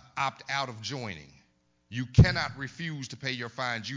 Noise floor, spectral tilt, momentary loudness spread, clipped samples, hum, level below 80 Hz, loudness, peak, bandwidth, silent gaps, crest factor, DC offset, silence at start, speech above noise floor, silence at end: -69 dBFS; -5.5 dB/octave; 15 LU; under 0.1%; none; -40 dBFS; -29 LUFS; -8 dBFS; 7.6 kHz; none; 22 dB; under 0.1%; 0.15 s; 40 dB; 0 s